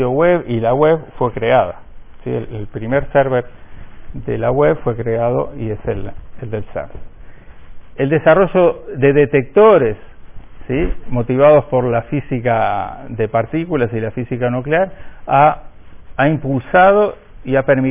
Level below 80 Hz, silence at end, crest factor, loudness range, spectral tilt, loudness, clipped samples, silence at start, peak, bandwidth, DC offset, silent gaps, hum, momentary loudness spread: -36 dBFS; 0 s; 16 dB; 6 LU; -11 dB/octave; -15 LUFS; under 0.1%; 0 s; 0 dBFS; 3.7 kHz; under 0.1%; none; none; 16 LU